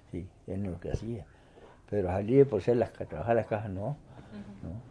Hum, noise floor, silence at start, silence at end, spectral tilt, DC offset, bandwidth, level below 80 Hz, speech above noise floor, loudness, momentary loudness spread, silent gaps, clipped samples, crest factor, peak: none; -55 dBFS; 0.15 s; 0 s; -9 dB/octave; under 0.1%; 10 kHz; -52 dBFS; 25 dB; -30 LUFS; 19 LU; none; under 0.1%; 22 dB; -10 dBFS